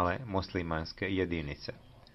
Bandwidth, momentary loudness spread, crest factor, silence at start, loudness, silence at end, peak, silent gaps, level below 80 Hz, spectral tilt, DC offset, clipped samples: 6.2 kHz; 12 LU; 20 dB; 0 s; -35 LUFS; 0.15 s; -16 dBFS; none; -52 dBFS; -7 dB/octave; under 0.1%; under 0.1%